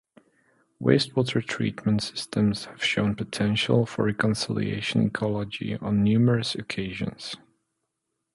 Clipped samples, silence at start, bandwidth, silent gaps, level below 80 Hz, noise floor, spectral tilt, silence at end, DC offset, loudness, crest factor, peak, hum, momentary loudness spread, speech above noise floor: under 0.1%; 0.8 s; 11.5 kHz; none; -54 dBFS; -81 dBFS; -6 dB/octave; 1 s; under 0.1%; -25 LUFS; 20 dB; -6 dBFS; none; 9 LU; 56 dB